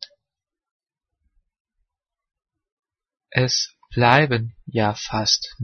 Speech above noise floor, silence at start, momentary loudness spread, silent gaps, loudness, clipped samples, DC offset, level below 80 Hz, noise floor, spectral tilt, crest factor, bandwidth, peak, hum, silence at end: 67 dB; 0 s; 11 LU; 0.71-0.80 s, 1.60-1.65 s, 2.72-2.77 s; -20 LUFS; under 0.1%; under 0.1%; -52 dBFS; -87 dBFS; -4 dB/octave; 24 dB; 6.6 kHz; 0 dBFS; none; 0 s